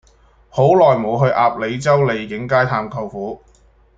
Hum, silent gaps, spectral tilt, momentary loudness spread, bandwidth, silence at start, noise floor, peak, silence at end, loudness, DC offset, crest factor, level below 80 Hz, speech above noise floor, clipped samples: none; none; -7 dB/octave; 14 LU; 8 kHz; 0.55 s; -51 dBFS; -2 dBFS; 0.6 s; -16 LUFS; under 0.1%; 16 dB; -50 dBFS; 36 dB; under 0.1%